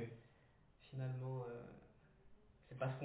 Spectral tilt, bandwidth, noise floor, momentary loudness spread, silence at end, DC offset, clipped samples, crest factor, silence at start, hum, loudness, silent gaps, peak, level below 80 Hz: -7.5 dB/octave; 4 kHz; -70 dBFS; 20 LU; 0 s; under 0.1%; under 0.1%; 20 dB; 0 s; none; -48 LUFS; none; -28 dBFS; -74 dBFS